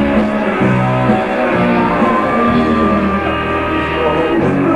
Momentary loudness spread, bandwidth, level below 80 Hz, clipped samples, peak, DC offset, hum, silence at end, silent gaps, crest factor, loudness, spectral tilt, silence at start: 3 LU; 11.5 kHz; -32 dBFS; under 0.1%; -2 dBFS; under 0.1%; none; 0 s; none; 12 dB; -13 LUFS; -7.5 dB/octave; 0 s